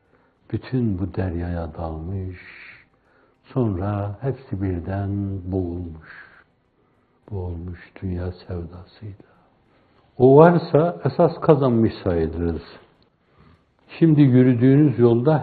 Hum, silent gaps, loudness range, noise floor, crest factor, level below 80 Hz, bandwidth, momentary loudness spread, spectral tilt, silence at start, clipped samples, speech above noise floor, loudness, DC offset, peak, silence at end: none; none; 16 LU; -63 dBFS; 22 dB; -48 dBFS; 4.7 kHz; 21 LU; -12 dB/octave; 0.5 s; under 0.1%; 43 dB; -20 LUFS; under 0.1%; 0 dBFS; 0 s